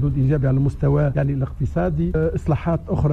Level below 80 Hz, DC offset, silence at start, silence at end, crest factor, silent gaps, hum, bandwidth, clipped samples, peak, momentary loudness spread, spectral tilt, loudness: -30 dBFS; under 0.1%; 0 s; 0 s; 12 dB; none; none; 4 kHz; under 0.1%; -8 dBFS; 4 LU; -10.5 dB/octave; -21 LUFS